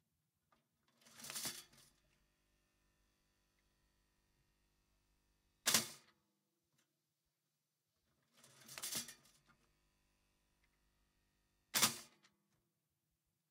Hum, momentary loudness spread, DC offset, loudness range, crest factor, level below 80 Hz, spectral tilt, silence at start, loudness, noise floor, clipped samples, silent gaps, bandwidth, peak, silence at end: none; 20 LU; under 0.1%; 9 LU; 32 dB; -86 dBFS; 0 dB/octave; 1.15 s; -39 LUFS; -89 dBFS; under 0.1%; none; 16 kHz; -18 dBFS; 1.45 s